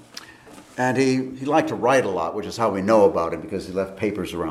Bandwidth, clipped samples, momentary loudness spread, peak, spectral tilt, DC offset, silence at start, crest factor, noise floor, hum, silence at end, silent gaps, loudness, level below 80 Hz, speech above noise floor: 14 kHz; under 0.1%; 11 LU; -4 dBFS; -5.5 dB/octave; under 0.1%; 0.15 s; 18 dB; -45 dBFS; none; 0 s; none; -22 LUFS; -56 dBFS; 24 dB